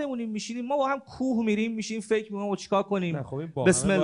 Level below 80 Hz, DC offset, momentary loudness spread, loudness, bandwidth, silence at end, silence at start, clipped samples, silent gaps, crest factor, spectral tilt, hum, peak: -56 dBFS; under 0.1%; 9 LU; -28 LUFS; 11 kHz; 0 s; 0 s; under 0.1%; none; 18 dB; -5 dB/octave; none; -8 dBFS